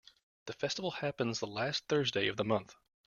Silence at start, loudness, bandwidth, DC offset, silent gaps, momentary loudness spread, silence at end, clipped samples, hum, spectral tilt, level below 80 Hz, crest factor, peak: 0.45 s; -35 LUFS; 7.4 kHz; under 0.1%; none; 6 LU; 0.35 s; under 0.1%; none; -4.5 dB/octave; -70 dBFS; 20 dB; -16 dBFS